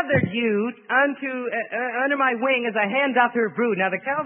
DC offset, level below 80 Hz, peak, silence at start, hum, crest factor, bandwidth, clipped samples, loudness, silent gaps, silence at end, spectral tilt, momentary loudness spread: under 0.1%; -64 dBFS; -4 dBFS; 0 s; none; 18 dB; 3.7 kHz; under 0.1%; -22 LUFS; none; 0 s; -10.5 dB/octave; 6 LU